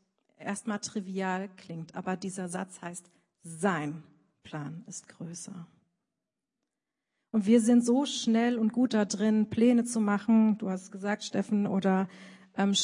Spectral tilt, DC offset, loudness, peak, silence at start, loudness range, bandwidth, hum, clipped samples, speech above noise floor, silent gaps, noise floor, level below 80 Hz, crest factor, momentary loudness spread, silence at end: -5 dB/octave; under 0.1%; -29 LUFS; -12 dBFS; 0.4 s; 12 LU; 11 kHz; none; under 0.1%; 59 dB; none; -88 dBFS; -76 dBFS; 18 dB; 18 LU; 0 s